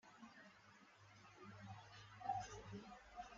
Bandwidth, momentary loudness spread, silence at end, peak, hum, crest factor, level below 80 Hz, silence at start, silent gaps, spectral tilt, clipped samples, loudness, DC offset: 7.4 kHz; 18 LU; 0 s; -32 dBFS; none; 22 dB; -74 dBFS; 0.05 s; none; -4 dB/octave; under 0.1%; -54 LUFS; under 0.1%